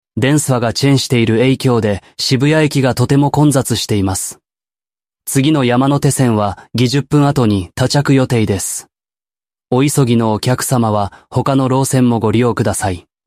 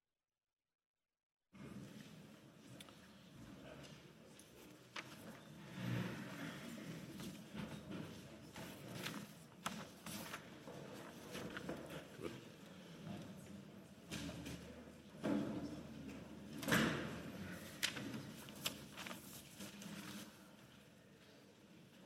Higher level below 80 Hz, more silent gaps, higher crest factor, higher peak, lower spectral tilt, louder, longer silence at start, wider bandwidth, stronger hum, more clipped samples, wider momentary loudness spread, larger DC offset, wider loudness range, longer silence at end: first, -46 dBFS vs -74 dBFS; neither; second, 12 dB vs 32 dB; first, -2 dBFS vs -18 dBFS; first, -5.5 dB/octave vs -4 dB/octave; first, -14 LUFS vs -48 LUFS; second, 0.15 s vs 1.55 s; about the same, 15.5 kHz vs 16 kHz; neither; neither; second, 6 LU vs 18 LU; neither; second, 2 LU vs 14 LU; first, 0.25 s vs 0 s